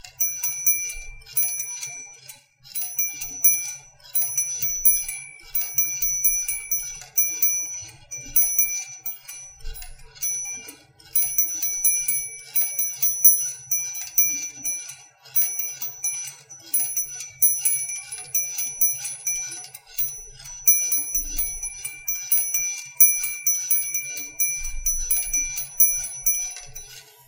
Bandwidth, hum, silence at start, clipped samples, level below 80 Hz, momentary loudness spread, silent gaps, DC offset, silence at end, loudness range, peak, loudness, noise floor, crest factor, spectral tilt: 17 kHz; none; 0.05 s; under 0.1%; -46 dBFS; 16 LU; none; under 0.1%; 0.25 s; 4 LU; -2 dBFS; -21 LUFS; -47 dBFS; 24 dB; 1.5 dB/octave